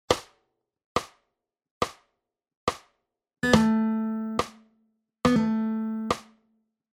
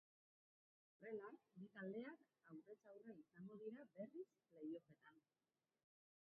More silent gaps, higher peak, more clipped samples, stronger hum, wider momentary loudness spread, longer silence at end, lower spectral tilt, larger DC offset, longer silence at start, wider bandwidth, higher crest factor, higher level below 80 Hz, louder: first, 0.84-0.95 s, 1.71-1.81 s, 2.57-2.67 s vs none; first, -4 dBFS vs -42 dBFS; neither; neither; about the same, 11 LU vs 10 LU; second, 0.7 s vs 1.1 s; about the same, -5 dB/octave vs -4.5 dB/octave; neither; second, 0.1 s vs 1 s; first, 15 kHz vs 3.5 kHz; first, 26 dB vs 18 dB; first, -54 dBFS vs under -90 dBFS; first, -27 LUFS vs -58 LUFS